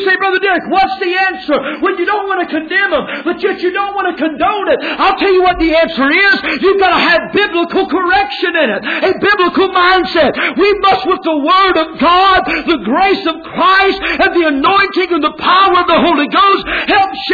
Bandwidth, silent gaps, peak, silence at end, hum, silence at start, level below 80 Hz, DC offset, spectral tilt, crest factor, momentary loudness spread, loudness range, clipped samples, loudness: 4.9 kHz; none; 0 dBFS; 0 s; none; 0 s; -40 dBFS; under 0.1%; -5.5 dB/octave; 10 dB; 6 LU; 4 LU; under 0.1%; -11 LUFS